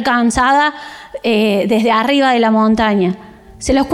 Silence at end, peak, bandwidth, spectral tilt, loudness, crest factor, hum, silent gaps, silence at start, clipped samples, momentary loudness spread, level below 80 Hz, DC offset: 0 s; -4 dBFS; 13 kHz; -5 dB/octave; -13 LUFS; 10 dB; none; none; 0 s; under 0.1%; 12 LU; -38 dBFS; under 0.1%